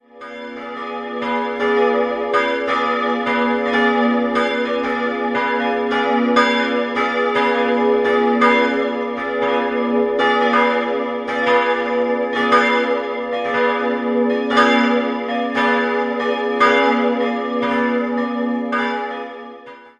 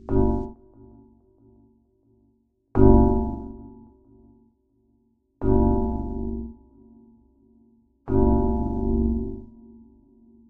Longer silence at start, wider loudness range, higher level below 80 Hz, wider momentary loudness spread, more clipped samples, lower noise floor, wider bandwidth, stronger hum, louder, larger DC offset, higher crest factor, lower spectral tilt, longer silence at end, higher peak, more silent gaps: about the same, 0.15 s vs 0.1 s; about the same, 2 LU vs 4 LU; second, -58 dBFS vs -30 dBFS; second, 8 LU vs 23 LU; neither; second, -38 dBFS vs -66 dBFS; first, 9 kHz vs 1.8 kHz; neither; first, -18 LUFS vs -23 LUFS; neither; second, 16 dB vs 24 dB; second, -4.5 dB/octave vs -13 dB/octave; second, 0.1 s vs 1.05 s; about the same, -2 dBFS vs 0 dBFS; neither